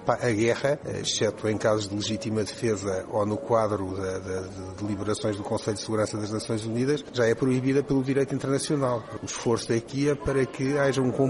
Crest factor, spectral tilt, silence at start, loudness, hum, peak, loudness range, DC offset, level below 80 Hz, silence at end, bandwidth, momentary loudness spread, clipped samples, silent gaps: 20 dB; -5.5 dB/octave; 0 s; -27 LUFS; none; -6 dBFS; 3 LU; under 0.1%; -52 dBFS; 0 s; 11.5 kHz; 7 LU; under 0.1%; none